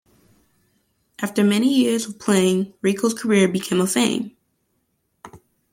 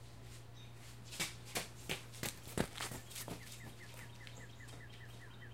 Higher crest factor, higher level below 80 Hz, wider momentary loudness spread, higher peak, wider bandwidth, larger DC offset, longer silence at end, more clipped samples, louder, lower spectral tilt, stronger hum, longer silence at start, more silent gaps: second, 18 dB vs 28 dB; about the same, -64 dBFS vs -62 dBFS; second, 8 LU vs 13 LU; first, -4 dBFS vs -20 dBFS; about the same, 16.5 kHz vs 16.5 kHz; second, under 0.1% vs 0.1%; first, 0.35 s vs 0 s; neither; first, -20 LUFS vs -46 LUFS; first, -4.5 dB/octave vs -3 dB/octave; neither; first, 1.2 s vs 0 s; neither